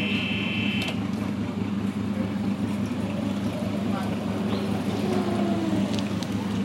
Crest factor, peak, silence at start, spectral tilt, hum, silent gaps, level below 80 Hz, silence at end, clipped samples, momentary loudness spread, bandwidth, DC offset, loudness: 16 dB; -10 dBFS; 0 s; -6 dB/octave; none; none; -54 dBFS; 0 s; under 0.1%; 3 LU; 15.5 kHz; under 0.1%; -27 LUFS